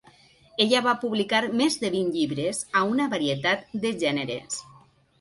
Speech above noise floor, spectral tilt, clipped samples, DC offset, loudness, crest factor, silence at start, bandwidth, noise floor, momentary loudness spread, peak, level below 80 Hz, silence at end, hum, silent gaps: 31 dB; -3.5 dB/octave; under 0.1%; under 0.1%; -25 LUFS; 18 dB; 0.6 s; 11.5 kHz; -56 dBFS; 8 LU; -8 dBFS; -66 dBFS; 0.55 s; none; none